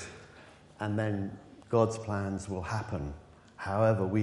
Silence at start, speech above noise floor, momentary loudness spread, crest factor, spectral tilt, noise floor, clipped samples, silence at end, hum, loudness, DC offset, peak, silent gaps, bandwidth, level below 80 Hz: 0 s; 24 dB; 20 LU; 20 dB; -7 dB/octave; -54 dBFS; under 0.1%; 0 s; none; -32 LUFS; under 0.1%; -12 dBFS; none; 11.5 kHz; -52 dBFS